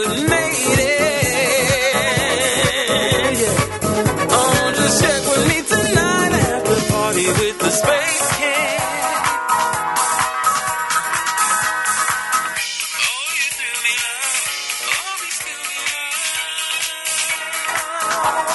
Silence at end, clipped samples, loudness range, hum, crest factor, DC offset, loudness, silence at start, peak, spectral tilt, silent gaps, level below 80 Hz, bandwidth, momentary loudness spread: 0 s; under 0.1%; 4 LU; none; 16 dB; under 0.1%; -17 LUFS; 0 s; -2 dBFS; -2.5 dB/octave; none; -42 dBFS; 12 kHz; 5 LU